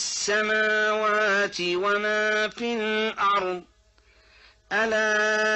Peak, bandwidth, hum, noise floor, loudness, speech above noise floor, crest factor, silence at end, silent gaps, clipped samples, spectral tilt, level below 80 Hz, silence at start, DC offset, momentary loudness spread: -12 dBFS; 8.2 kHz; none; -59 dBFS; -23 LUFS; 35 dB; 12 dB; 0 s; none; under 0.1%; -2 dB/octave; -64 dBFS; 0 s; under 0.1%; 5 LU